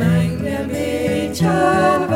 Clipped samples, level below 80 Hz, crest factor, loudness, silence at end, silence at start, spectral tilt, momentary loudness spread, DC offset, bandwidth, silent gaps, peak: under 0.1%; -40 dBFS; 14 dB; -18 LUFS; 0 s; 0 s; -6.5 dB/octave; 7 LU; under 0.1%; 16 kHz; none; -2 dBFS